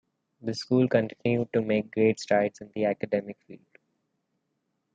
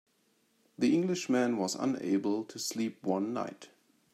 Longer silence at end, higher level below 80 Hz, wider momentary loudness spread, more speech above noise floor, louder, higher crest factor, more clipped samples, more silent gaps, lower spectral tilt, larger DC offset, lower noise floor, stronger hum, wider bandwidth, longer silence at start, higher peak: first, 1.4 s vs 0.45 s; first, -70 dBFS vs -80 dBFS; first, 11 LU vs 7 LU; first, 52 dB vs 41 dB; first, -27 LUFS vs -32 LUFS; about the same, 18 dB vs 16 dB; neither; neither; first, -6.5 dB/octave vs -5 dB/octave; neither; first, -78 dBFS vs -72 dBFS; neither; second, 9 kHz vs 14 kHz; second, 0.45 s vs 0.8 s; first, -10 dBFS vs -16 dBFS